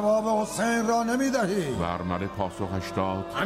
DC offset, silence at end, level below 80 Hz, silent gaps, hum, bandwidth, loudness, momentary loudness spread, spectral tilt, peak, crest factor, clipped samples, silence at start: under 0.1%; 0 s; -52 dBFS; none; none; 16 kHz; -27 LUFS; 6 LU; -5 dB/octave; -12 dBFS; 14 dB; under 0.1%; 0 s